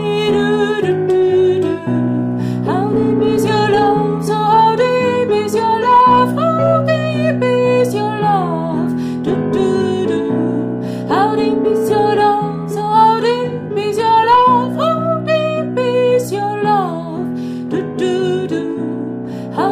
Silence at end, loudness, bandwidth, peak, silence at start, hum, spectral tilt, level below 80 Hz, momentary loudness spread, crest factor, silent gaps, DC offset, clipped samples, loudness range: 0 s; -15 LUFS; 15 kHz; 0 dBFS; 0 s; none; -6.5 dB/octave; -50 dBFS; 9 LU; 14 dB; none; under 0.1%; under 0.1%; 4 LU